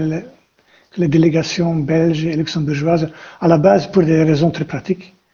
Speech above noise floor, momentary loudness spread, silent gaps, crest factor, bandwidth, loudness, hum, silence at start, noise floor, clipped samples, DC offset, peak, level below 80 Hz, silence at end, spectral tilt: 39 dB; 11 LU; none; 16 dB; 7.2 kHz; -16 LUFS; none; 0 s; -54 dBFS; under 0.1%; under 0.1%; 0 dBFS; -46 dBFS; 0.25 s; -7 dB/octave